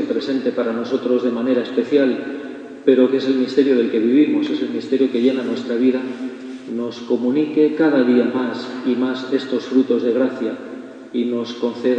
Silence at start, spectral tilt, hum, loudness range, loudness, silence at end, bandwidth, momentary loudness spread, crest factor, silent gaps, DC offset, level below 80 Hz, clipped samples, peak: 0 s; -6.5 dB/octave; none; 3 LU; -19 LUFS; 0 s; 8 kHz; 11 LU; 18 dB; none; under 0.1%; -70 dBFS; under 0.1%; 0 dBFS